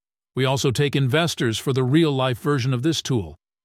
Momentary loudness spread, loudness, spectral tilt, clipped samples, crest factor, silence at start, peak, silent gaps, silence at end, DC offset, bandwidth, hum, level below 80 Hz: 7 LU; -21 LUFS; -5.5 dB/octave; under 0.1%; 16 dB; 0.35 s; -6 dBFS; none; 0.3 s; under 0.1%; 15.5 kHz; none; -54 dBFS